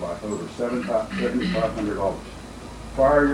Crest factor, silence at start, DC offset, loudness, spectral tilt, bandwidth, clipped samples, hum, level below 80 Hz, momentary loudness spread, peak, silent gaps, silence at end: 18 dB; 0 s; under 0.1%; -24 LUFS; -6 dB/octave; 13.5 kHz; under 0.1%; none; -40 dBFS; 18 LU; -6 dBFS; none; 0 s